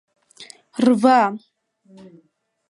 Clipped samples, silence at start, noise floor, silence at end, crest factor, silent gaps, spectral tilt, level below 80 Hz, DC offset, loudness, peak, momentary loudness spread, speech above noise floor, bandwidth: under 0.1%; 0.4 s; -46 dBFS; 1.3 s; 20 dB; none; -5.5 dB/octave; -74 dBFS; under 0.1%; -17 LUFS; -2 dBFS; 19 LU; 28 dB; 11.5 kHz